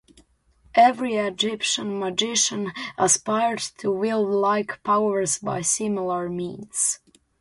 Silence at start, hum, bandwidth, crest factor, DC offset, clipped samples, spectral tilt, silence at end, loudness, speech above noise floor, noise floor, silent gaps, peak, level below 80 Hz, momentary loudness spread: 0.75 s; none; 11.5 kHz; 18 dB; under 0.1%; under 0.1%; -2.5 dB/octave; 0.45 s; -23 LUFS; 36 dB; -59 dBFS; none; -6 dBFS; -64 dBFS; 9 LU